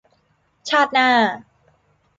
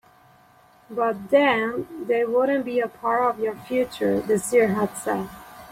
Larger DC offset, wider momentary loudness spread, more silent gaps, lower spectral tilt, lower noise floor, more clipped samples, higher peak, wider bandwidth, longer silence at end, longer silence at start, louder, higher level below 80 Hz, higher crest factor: neither; first, 20 LU vs 9 LU; neither; second, -3 dB/octave vs -5 dB/octave; first, -64 dBFS vs -55 dBFS; neither; about the same, -4 dBFS vs -6 dBFS; second, 9.2 kHz vs 16.5 kHz; first, 0.8 s vs 0 s; second, 0.65 s vs 0.9 s; first, -17 LUFS vs -23 LUFS; second, -68 dBFS vs -60 dBFS; about the same, 16 dB vs 18 dB